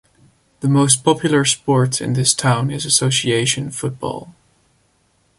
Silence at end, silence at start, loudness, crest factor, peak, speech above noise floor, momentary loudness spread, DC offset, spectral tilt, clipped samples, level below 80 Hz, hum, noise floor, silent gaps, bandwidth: 1.05 s; 0.6 s; -16 LUFS; 18 dB; 0 dBFS; 44 dB; 11 LU; under 0.1%; -4 dB/octave; under 0.1%; -54 dBFS; none; -61 dBFS; none; 11.5 kHz